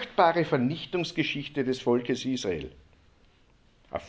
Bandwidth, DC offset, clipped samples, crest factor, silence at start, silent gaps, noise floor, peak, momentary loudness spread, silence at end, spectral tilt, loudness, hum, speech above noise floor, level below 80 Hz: 8 kHz; under 0.1%; under 0.1%; 22 dB; 0 s; none; -61 dBFS; -8 dBFS; 11 LU; 0 s; -5.5 dB/octave; -28 LUFS; none; 34 dB; -58 dBFS